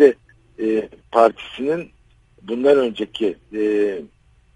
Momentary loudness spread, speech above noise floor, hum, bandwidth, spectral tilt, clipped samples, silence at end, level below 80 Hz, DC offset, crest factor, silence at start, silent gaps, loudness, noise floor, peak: 12 LU; 32 dB; none; 9 kHz; -6 dB/octave; under 0.1%; 0.5 s; -56 dBFS; under 0.1%; 20 dB; 0 s; none; -20 LUFS; -51 dBFS; 0 dBFS